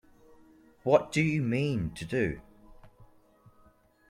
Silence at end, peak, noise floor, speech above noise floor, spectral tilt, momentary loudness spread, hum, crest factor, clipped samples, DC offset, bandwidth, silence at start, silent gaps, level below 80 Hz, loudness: 1.05 s; -8 dBFS; -62 dBFS; 34 dB; -6.5 dB/octave; 9 LU; none; 22 dB; under 0.1%; under 0.1%; 13 kHz; 0.85 s; none; -56 dBFS; -29 LUFS